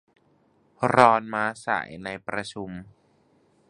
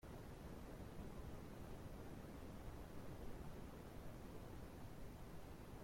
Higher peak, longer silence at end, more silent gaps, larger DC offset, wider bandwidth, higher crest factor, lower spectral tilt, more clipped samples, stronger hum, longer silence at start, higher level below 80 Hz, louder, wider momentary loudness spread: first, 0 dBFS vs -40 dBFS; first, 0.85 s vs 0 s; neither; neither; second, 11.5 kHz vs 16.5 kHz; first, 26 dB vs 12 dB; about the same, -5.5 dB/octave vs -6.5 dB/octave; neither; neither; first, 0.8 s vs 0.05 s; about the same, -62 dBFS vs -60 dBFS; first, -24 LUFS vs -56 LUFS; first, 19 LU vs 2 LU